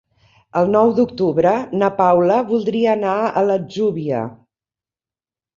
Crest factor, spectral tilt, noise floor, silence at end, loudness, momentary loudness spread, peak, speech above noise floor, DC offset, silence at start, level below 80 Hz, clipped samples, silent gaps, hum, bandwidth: 16 dB; -8 dB/octave; under -90 dBFS; 1.25 s; -17 LUFS; 8 LU; -2 dBFS; over 74 dB; under 0.1%; 0.55 s; -58 dBFS; under 0.1%; none; none; 7.4 kHz